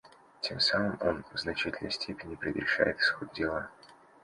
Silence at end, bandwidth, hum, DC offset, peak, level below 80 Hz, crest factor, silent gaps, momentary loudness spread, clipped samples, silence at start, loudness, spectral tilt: 0.3 s; 11.5 kHz; none; under 0.1%; -12 dBFS; -58 dBFS; 22 dB; none; 11 LU; under 0.1%; 0.05 s; -31 LUFS; -4.5 dB/octave